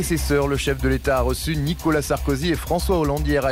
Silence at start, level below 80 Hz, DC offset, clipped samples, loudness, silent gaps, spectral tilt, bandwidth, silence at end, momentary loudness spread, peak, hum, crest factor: 0 s; -28 dBFS; under 0.1%; under 0.1%; -22 LUFS; none; -5.5 dB/octave; 16 kHz; 0 s; 2 LU; -10 dBFS; none; 10 dB